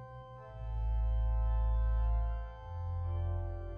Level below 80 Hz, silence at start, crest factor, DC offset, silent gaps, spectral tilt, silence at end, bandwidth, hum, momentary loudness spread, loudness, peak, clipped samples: -34 dBFS; 0 s; 10 dB; under 0.1%; none; -9.5 dB/octave; 0 s; 3.3 kHz; none; 12 LU; -37 LUFS; -24 dBFS; under 0.1%